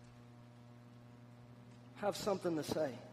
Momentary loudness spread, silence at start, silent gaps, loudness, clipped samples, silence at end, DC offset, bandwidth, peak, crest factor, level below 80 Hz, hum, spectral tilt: 21 LU; 0 s; none; -39 LUFS; under 0.1%; 0 s; under 0.1%; 15 kHz; -24 dBFS; 20 dB; -74 dBFS; 60 Hz at -60 dBFS; -5 dB/octave